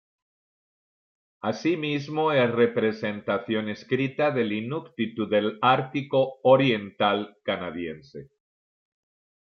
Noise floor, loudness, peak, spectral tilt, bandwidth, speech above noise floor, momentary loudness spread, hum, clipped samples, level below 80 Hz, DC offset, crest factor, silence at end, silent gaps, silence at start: under -90 dBFS; -25 LUFS; -6 dBFS; -7 dB/octave; 6.8 kHz; over 65 dB; 12 LU; none; under 0.1%; -70 dBFS; under 0.1%; 20 dB; 1.2 s; none; 1.45 s